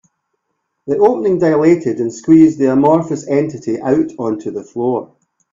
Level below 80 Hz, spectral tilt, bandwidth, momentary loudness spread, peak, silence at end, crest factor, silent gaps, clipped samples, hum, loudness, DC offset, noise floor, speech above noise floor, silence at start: -54 dBFS; -8 dB/octave; 7.6 kHz; 11 LU; 0 dBFS; 0.5 s; 14 dB; none; under 0.1%; none; -14 LUFS; under 0.1%; -71 dBFS; 58 dB; 0.85 s